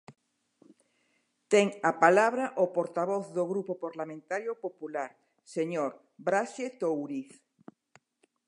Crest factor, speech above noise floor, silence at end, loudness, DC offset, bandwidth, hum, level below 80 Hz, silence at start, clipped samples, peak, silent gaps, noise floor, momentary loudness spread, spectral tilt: 26 dB; 45 dB; 1.25 s; -30 LUFS; under 0.1%; 11 kHz; none; -88 dBFS; 0.1 s; under 0.1%; -6 dBFS; none; -74 dBFS; 14 LU; -5 dB/octave